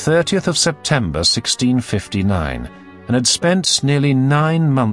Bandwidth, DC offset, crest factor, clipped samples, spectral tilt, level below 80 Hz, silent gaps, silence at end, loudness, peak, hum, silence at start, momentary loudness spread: 12 kHz; under 0.1%; 16 dB; under 0.1%; -4.5 dB/octave; -40 dBFS; none; 0 s; -16 LUFS; -2 dBFS; none; 0 s; 7 LU